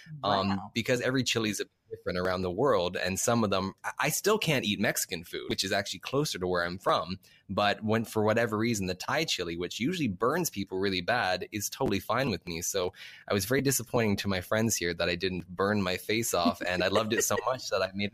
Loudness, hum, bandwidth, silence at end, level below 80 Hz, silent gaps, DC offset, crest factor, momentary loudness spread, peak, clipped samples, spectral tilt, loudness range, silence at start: -29 LUFS; none; 15.5 kHz; 0.05 s; -60 dBFS; none; under 0.1%; 18 dB; 6 LU; -12 dBFS; under 0.1%; -4 dB/octave; 2 LU; 0 s